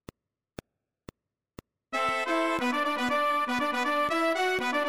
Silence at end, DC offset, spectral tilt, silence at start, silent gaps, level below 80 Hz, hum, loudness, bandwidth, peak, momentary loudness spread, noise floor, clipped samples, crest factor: 0 s; under 0.1%; -3 dB/octave; 1.9 s; none; -64 dBFS; none; -27 LUFS; 16 kHz; -14 dBFS; 2 LU; -53 dBFS; under 0.1%; 14 dB